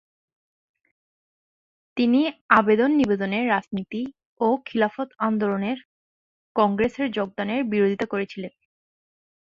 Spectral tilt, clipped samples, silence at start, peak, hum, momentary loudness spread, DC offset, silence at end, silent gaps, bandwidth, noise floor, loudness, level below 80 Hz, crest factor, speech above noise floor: -7.5 dB/octave; under 0.1%; 1.95 s; -2 dBFS; none; 13 LU; under 0.1%; 1 s; 2.41-2.49 s, 4.25-4.36 s, 5.85-6.55 s; 7.4 kHz; under -90 dBFS; -23 LUFS; -60 dBFS; 22 dB; over 68 dB